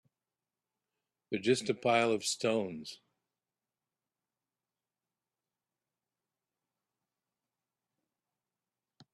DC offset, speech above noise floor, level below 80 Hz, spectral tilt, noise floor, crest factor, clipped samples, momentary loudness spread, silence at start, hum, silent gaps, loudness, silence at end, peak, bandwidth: under 0.1%; over 58 dB; -80 dBFS; -3.5 dB/octave; under -90 dBFS; 24 dB; under 0.1%; 13 LU; 1.3 s; none; none; -32 LUFS; 6.2 s; -14 dBFS; 13 kHz